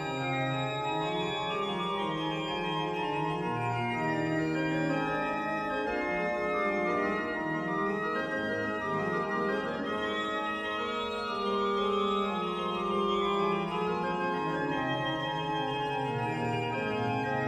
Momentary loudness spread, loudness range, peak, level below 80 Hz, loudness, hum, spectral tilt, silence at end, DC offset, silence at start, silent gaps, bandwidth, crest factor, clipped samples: 3 LU; 1 LU; -18 dBFS; -60 dBFS; -31 LUFS; none; -6 dB/octave; 0 s; under 0.1%; 0 s; none; 12.5 kHz; 14 dB; under 0.1%